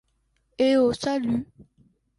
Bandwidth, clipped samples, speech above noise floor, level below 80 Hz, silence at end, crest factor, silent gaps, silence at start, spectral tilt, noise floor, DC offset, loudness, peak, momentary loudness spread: 11.5 kHz; under 0.1%; 47 dB; -58 dBFS; 0.75 s; 16 dB; none; 0.6 s; -5.5 dB/octave; -70 dBFS; under 0.1%; -24 LUFS; -10 dBFS; 9 LU